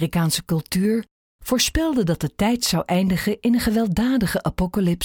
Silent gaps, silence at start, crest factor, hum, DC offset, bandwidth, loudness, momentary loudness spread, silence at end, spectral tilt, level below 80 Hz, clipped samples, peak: 1.11-1.39 s; 0 s; 14 dB; none; under 0.1%; over 20 kHz; -21 LUFS; 4 LU; 0 s; -5 dB/octave; -38 dBFS; under 0.1%; -6 dBFS